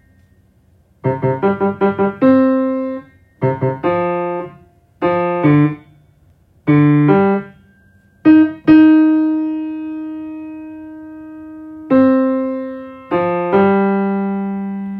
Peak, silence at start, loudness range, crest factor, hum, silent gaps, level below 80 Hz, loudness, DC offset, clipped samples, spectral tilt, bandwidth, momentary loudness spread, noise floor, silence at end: 0 dBFS; 1.05 s; 6 LU; 14 dB; none; none; -56 dBFS; -15 LUFS; under 0.1%; under 0.1%; -11 dB/octave; 4.4 kHz; 21 LU; -53 dBFS; 0 s